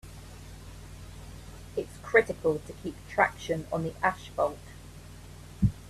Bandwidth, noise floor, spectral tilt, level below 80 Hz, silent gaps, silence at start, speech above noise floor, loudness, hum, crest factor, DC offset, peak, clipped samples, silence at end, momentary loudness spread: 14.5 kHz; -47 dBFS; -6 dB/octave; -48 dBFS; none; 0.05 s; 17 dB; -30 LUFS; none; 26 dB; under 0.1%; -6 dBFS; under 0.1%; 0 s; 23 LU